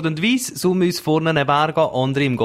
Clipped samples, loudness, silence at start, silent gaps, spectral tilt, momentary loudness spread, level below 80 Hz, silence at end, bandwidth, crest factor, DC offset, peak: under 0.1%; -18 LUFS; 0 s; none; -5 dB/octave; 2 LU; -56 dBFS; 0 s; 16 kHz; 16 dB; under 0.1%; -2 dBFS